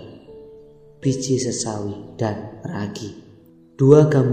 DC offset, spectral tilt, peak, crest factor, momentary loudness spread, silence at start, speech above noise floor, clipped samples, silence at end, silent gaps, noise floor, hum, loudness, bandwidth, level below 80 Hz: under 0.1%; -6.5 dB/octave; 0 dBFS; 20 dB; 19 LU; 0 s; 30 dB; under 0.1%; 0 s; none; -48 dBFS; none; -20 LUFS; 9.4 kHz; -52 dBFS